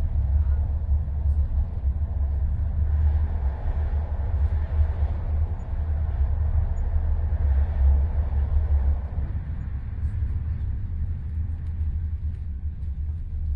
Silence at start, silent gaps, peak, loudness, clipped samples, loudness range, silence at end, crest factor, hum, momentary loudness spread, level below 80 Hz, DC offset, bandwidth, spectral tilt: 0 s; none; -10 dBFS; -27 LUFS; under 0.1%; 5 LU; 0 s; 14 dB; none; 8 LU; -26 dBFS; under 0.1%; 2.4 kHz; -10.5 dB/octave